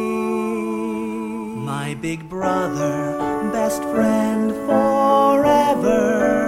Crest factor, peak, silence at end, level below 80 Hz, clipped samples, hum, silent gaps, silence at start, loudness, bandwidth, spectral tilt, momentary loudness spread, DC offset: 16 dB; -2 dBFS; 0 s; -48 dBFS; under 0.1%; none; none; 0 s; -20 LUFS; 16 kHz; -6 dB/octave; 11 LU; under 0.1%